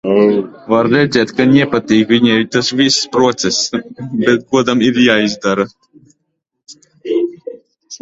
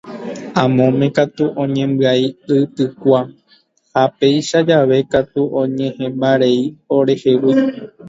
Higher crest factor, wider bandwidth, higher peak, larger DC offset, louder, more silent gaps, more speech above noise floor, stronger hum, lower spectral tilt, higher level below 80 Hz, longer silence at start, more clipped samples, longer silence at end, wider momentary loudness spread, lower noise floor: about the same, 14 dB vs 16 dB; about the same, 8 kHz vs 7.8 kHz; about the same, 0 dBFS vs 0 dBFS; neither; about the same, -13 LUFS vs -15 LUFS; neither; first, 58 dB vs 40 dB; neither; second, -4.5 dB/octave vs -6.5 dB/octave; about the same, -52 dBFS vs -56 dBFS; about the same, 0.05 s vs 0.05 s; neither; about the same, 0.05 s vs 0 s; first, 11 LU vs 7 LU; first, -70 dBFS vs -55 dBFS